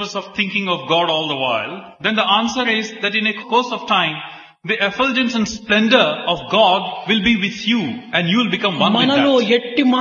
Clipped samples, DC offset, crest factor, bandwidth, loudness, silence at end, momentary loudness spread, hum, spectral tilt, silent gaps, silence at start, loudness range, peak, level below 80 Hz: under 0.1%; under 0.1%; 18 dB; 7.2 kHz; -17 LUFS; 0 s; 7 LU; none; -4.5 dB/octave; none; 0 s; 2 LU; 0 dBFS; -52 dBFS